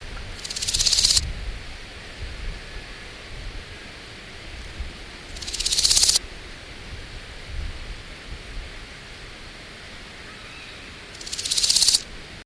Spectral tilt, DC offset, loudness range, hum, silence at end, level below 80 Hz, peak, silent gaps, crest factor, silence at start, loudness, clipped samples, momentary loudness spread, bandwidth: 0 dB/octave; under 0.1%; 15 LU; none; 0 s; -38 dBFS; -2 dBFS; none; 26 dB; 0 s; -19 LUFS; under 0.1%; 23 LU; 11 kHz